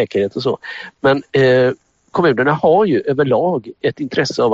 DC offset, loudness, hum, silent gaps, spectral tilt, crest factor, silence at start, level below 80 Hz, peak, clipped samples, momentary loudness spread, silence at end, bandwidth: under 0.1%; -16 LUFS; none; none; -6.5 dB/octave; 14 dB; 0 s; -54 dBFS; 0 dBFS; under 0.1%; 9 LU; 0 s; 7.8 kHz